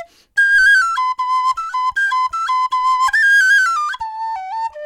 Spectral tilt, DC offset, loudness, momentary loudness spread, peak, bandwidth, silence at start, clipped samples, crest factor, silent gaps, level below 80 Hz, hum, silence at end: 3 dB/octave; under 0.1%; -14 LUFS; 14 LU; -4 dBFS; 16 kHz; 0 s; under 0.1%; 12 dB; none; -54 dBFS; none; 0 s